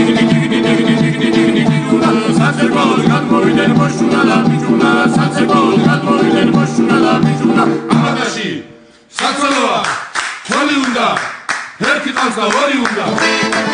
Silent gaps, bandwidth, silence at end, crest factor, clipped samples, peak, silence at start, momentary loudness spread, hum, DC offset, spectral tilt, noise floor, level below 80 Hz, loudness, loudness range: none; 10 kHz; 0 s; 12 dB; under 0.1%; 0 dBFS; 0 s; 6 LU; none; under 0.1%; -5.5 dB/octave; -40 dBFS; -50 dBFS; -12 LUFS; 4 LU